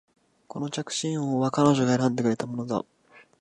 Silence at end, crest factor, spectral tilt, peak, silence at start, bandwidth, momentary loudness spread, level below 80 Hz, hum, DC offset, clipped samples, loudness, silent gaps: 0.6 s; 20 dB; -5.5 dB/octave; -6 dBFS; 0.55 s; 11.5 kHz; 12 LU; -64 dBFS; none; under 0.1%; under 0.1%; -26 LUFS; none